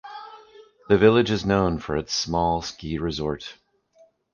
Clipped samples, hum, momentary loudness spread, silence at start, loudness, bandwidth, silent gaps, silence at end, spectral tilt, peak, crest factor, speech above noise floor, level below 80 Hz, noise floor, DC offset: under 0.1%; none; 22 LU; 0.05 s; -23 LUFS; 7.2 kHz; none; 0.8 s; -5.5 dB/octave; -4 dBFS; 20 dB; 36 dB; -44 dBFS; -59 dBFS; under 0.1%